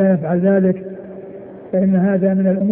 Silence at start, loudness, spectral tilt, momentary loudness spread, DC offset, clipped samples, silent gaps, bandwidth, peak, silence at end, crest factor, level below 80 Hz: 0 s; -16 LUFS; -14 dB/octave; 19 LU; under 0.1%; under 0.1%; none; 2.8 kHz; -4 dBFS; 0 s; 12 dB; -56 dBFS